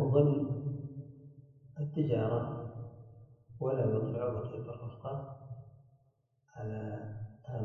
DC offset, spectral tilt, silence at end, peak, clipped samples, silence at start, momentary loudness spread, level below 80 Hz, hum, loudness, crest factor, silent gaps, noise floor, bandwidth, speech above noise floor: under 0.1%; -11 dB/octave; 0 s; -14 dBFS; under 0.1%; 0 s; 21 LU; -64 dBFS; none; -36 LUFS; 20 dB; none; -73 dBFS; 3.3 kHz; 38 dB